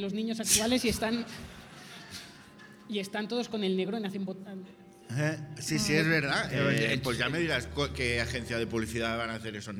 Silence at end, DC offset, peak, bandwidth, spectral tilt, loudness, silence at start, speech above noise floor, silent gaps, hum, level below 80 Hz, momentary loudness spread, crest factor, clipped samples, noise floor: 0 s; under 0.1%; -10 dBFS; 18 kHz; -4 dB/octave; -30 LUFS; 0 s; 21 dB; none; none; -52 dBFS; 19 LU; 20 dB; under 0.1%; -52 dBFS